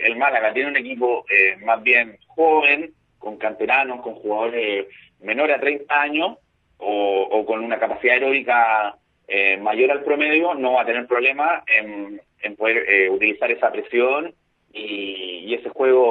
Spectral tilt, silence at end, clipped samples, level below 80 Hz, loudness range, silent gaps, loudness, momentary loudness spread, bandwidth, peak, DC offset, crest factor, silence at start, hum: -6 dB/octave; 0 s; under 0.1%; -70 dBFS; 4 LU; none; -19 LUFS; 14 LU; 4.8 kHz; 0 dBFS; under 0.1%; 20 dB; 0 s; none